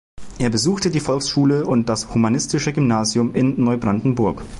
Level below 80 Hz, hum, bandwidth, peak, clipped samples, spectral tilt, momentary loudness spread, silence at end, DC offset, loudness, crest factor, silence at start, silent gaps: -42 dBFS; none; 11.5 kHz; -6 dBFS; under 0.1%; -5.5 dB/octave; 3 LU; 0 s; under 0.1%; -19 LUFS; 12 dB; 0.2 s; none